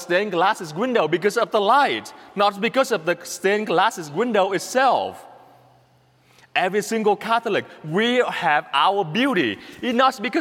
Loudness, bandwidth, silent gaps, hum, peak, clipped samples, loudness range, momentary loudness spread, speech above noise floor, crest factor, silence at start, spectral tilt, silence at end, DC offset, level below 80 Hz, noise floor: -21 LUFS; 16.5 kHz; none; none; -4 dBFS; under 0.1%; 3 LU; 7 LU; 37 dB; 16 dB; 0 s; -4 dB/octave; 0 s; under 0.1%; -72 dBFS; -57 dBFS